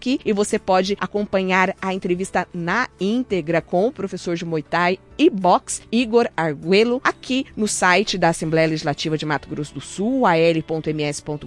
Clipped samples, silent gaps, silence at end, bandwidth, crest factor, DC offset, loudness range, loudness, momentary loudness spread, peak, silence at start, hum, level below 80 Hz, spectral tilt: under 0.1%; none; 0 s; 12 kHz; 18 dB; under 0.1%; 3 LU; -20 LUFS; 9 LU; -2 dBFS; 0 s; none; -50 dBFS; -4.5 dB/octave